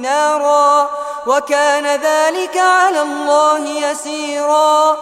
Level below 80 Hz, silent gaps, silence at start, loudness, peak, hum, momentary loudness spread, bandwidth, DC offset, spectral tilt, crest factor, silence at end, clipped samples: -64 dBFS; none; 0 s; -14 LUFS; -2 dBFS; none; 8 LU; 15 kHz; under 0.1%; 0 dB/octave; 12 dB; 0 s; under 0.1%